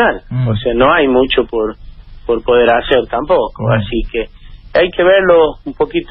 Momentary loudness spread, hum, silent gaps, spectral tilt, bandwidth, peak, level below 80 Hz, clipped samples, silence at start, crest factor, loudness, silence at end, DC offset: 9 LU; none; none; -9.5 dB/octave; 5.4 kHz; 0 dBFS; -30 dBFS; under 0.1%; 0 s; 12 dB; -13 LUFS; 0.05 s; under 0.1%